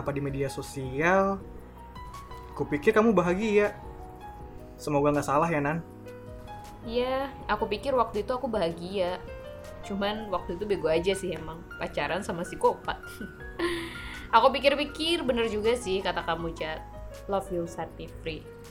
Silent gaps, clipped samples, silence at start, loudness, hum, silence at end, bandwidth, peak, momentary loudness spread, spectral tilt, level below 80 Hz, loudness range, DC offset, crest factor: none; under 0.1%; 0 s; -28 LUFS; none; 0 s; 17 kHz; -6 dBFS; 19 LU; -5.5 dB/octave; -48 dBFS; 4 LU; under 0.1%; 22 dB